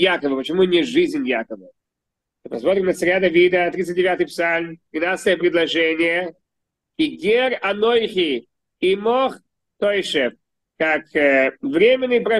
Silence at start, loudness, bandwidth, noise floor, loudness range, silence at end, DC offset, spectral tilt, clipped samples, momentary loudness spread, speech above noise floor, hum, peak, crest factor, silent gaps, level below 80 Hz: 0 s; -19 LUFS; 12.5 kHz; -82 dBFS; 2 LU; 0 s; under 0.1%; -5 dB/octave; under 0.1%; 8 LU; 64 dB; none; -4 dBFS; 16 dB; none; -58 dBFS